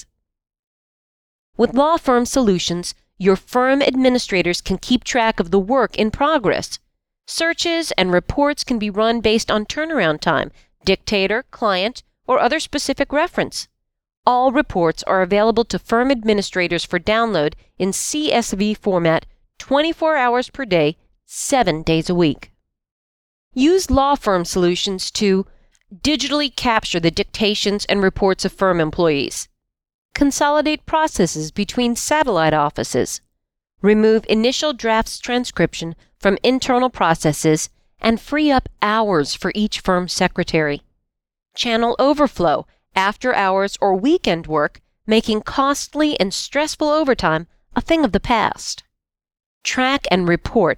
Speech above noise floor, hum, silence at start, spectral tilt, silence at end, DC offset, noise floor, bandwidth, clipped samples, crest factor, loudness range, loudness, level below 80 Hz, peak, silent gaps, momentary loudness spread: 56 dB; none; 1.6 s; -4 dB/octave; 0 s; under 0.1%; -74 dBFS; 17.5 kHz; under 0.1%; 18 dB; 2 LU; -18 LUFS; -40 dBFS; 0 dBFS; 14.17-14.23 s, 22.91-23.51 s, 29.94-30.09 s, 49.46-49.61 s; 7 LU